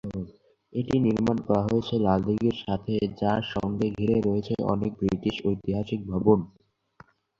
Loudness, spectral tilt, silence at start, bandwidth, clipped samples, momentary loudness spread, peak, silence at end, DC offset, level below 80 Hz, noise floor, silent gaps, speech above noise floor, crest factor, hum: -26 LUFS; -8.5 dB/octave; 0.05 s; 7.4 kHz; under 0.1%; 7 LU; -6 dBFS; 0.9 s; under 0.1%; -50 dBFS; -56 dBFS; none; 31 dB; 20 dB; none